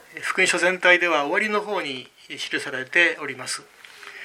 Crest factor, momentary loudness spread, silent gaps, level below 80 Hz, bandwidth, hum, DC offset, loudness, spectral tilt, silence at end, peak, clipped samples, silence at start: 20 dB; 16 LU; none; -76 dBFS; 16 kHz; none; under 0.1%; -21 LUFS; -2 dB/octave; 0 s; -2 dBFS; under 0.1%; 0.1 s